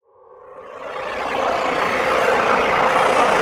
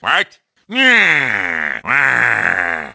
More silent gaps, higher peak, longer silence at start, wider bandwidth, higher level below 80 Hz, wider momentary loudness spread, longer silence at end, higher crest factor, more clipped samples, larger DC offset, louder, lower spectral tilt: neither; second, -4 dBFS vs 0 dBFS; first, 0.45 s vs 0.05 s; first, 17 kHz vs 8 kHz; about the same, -50 dBFS vs -54 dBFS; first, 14 LU vs 9 LU; about the same, 0 s vs 0 s; about the same, 16 dB vs 16 dB; neither; neither; second, -18 LUFS vs -13 LUFS; about the same, -3.5 dB/octave vs -3 dB/octave